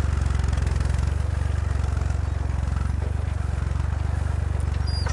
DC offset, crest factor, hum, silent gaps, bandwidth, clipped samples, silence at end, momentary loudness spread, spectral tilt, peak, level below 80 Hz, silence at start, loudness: under 0.1%; 12 dB; none; none; 11 kHz; under 0.1%; 0 s; 2 LU; -6.5 dB/octave; -12 dBFS; -26 dBFS; 0 s; -26 LUFS